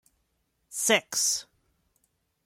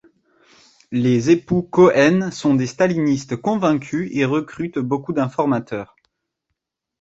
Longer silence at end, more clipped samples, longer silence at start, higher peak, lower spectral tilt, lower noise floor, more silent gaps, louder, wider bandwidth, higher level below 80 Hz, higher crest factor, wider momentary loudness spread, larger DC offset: second, 1.05 s vs 1.2 s; neither; second, 0.7 s vs 0.9 s; second, -8 dBFS vs -2 dBFS; second, 0 dB/octave vs -6.5 dB/octave; about the same, -75 dBFS vs -78 dBFS; neither; second, -25 LUFS vs -19 LUFS; first, 16.5 kHz vs 8 kHz; second, -76 dBFS vs -56 dBFS; first, 24 dB vs 18 dB; about the same, 9 LU vs 11 LU; neither